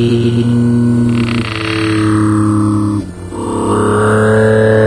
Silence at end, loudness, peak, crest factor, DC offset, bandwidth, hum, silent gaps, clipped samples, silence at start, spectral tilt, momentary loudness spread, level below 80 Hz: 0 s; -12 LUFS; 0 dBFS; 10 dB; under 0.1%; 11 kHz; none; none; under 0.1%; 0 s; -7 dB/octave; 8 LU; -36 dBFS